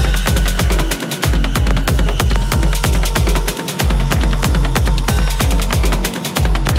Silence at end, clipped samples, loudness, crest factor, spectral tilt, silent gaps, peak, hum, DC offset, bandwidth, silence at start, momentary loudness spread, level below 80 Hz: 0 s; under 0.1%; -17 LUFS; 12 dB; -4.5 dB/octave; none; -2 dBFS; none; under 0.1%; 16.5 kHz; 0 s; 2 LU; -16 dBFS